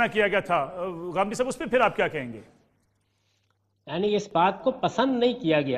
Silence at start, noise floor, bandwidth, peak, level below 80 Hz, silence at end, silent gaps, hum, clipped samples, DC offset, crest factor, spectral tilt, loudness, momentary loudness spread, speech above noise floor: 0 s; -71 dBFS; 13 kHz; -8 dBFS; -60 dBFS; 0 s; none; none; under 0.1%; under 0.1%; 18 dB; -5 dB/octave; -25 LUFS; 10 LU; 46 dB